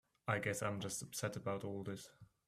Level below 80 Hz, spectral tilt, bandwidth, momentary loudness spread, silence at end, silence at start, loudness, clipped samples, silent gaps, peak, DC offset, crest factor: -74 dBFS; -4.5 dB/octave; 15.5 kHz; 10 LU; 0.2 s; 0.25 s; -42 LUFS; under 0.1%; none; -20 dBFS; under 0.1%; 22 dB